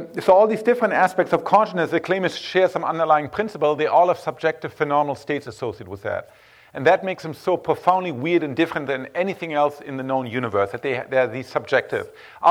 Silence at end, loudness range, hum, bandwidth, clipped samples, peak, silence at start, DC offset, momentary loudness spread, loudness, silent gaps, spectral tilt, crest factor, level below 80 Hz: 0 s; 4 LU; none; 16 kHz; under 0.1%; -4 dBFS; 0 s; under 0.1%; 11 LU; -21 LUFS; none; -6 dB/octave; 18 dB; -64 dBFS